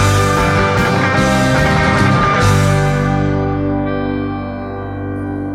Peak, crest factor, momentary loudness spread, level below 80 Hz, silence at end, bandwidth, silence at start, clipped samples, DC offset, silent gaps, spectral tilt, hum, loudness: 0 dBFS; 14 dB; 11 LU; -28 dBFS; 0 s; 15 kHz; 0 s; under 0.1%; under 0.1%; none; -6 dB/octave; none; -14 LUFS